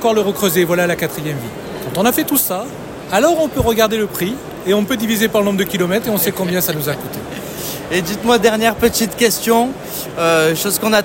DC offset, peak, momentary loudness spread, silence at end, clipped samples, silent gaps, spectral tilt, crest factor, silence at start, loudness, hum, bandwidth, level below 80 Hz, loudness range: under 0.1%; 0 dBFS; 11 LU; 0 s; under 0.1%; none; -4 dB/octave; 16 dB; 0 s; -16 LUFS; none; 17 kHz; -44 dBFS; 2 LU